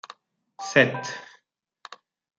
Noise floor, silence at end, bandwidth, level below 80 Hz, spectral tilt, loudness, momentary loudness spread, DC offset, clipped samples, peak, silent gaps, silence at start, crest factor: -67 dBFS; 0.45 s; 9.2 kHz; -74 dBFS; -4.5 dB/octave; -23 LUFS; 26 LU; under 0.1%; under 0.1%; -2 dBFS; none; 0.6 s; 26 dB